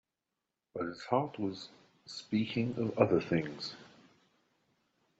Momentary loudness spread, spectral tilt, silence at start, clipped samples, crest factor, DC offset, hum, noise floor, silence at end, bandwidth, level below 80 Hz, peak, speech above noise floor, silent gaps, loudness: 18 LU; -5.5 dB/octave; 0.75 s; under 0.1%; 24 dB; under 0.1%; none; -88 dBFS; 1.3 s; 8 kHz; -72 dBFS; -12 dBFS; 55 dB; none; -34 LUFS